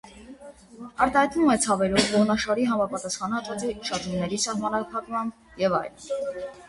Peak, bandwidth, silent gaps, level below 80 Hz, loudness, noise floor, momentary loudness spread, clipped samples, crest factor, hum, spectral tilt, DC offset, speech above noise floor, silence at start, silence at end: -4 dBFS; 11.5 kHz; none; -54 dBFS; -25 LUFS; -46 dBFS; 12 LU; under 0.1%; 20 dB; none; -4 dB/octave; under 0.1%; 20 dB; 0.05 s; 0 s